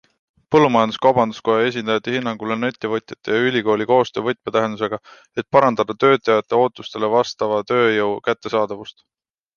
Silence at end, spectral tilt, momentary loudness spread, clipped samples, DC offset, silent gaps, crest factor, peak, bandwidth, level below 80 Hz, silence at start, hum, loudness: 0.65 s; -6 dB/octave; 9 LU; under 0.1%; under 0.1%; none; 18 dB; -2 dBFS; 7 kHz; -60 dBFS; 0.5 s; none; -19 LUFS